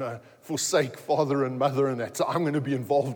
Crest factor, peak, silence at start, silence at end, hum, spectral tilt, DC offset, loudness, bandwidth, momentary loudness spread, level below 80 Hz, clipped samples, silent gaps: 16 dB; -10 dBFS; 0 s; 0 s; none; -5 dB/octave; under 0.1%; -27 LUFS; 19.5 kHz; 6 LU; -78 dBFS; under 0.1%; none